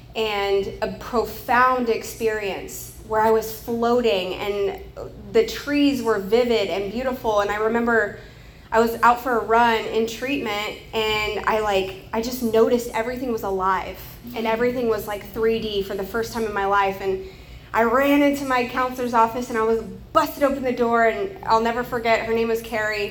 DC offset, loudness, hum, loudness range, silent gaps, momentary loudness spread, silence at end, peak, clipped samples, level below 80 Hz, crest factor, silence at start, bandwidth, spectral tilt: under 0.1%; -22 LUFS; none; 3 LU; none; 9 LU; 0 s; -4 dBFS; under 0.1%; -46 dBFS; 18 dB; 0 s; over 20 kHz; -4.5 dB/octave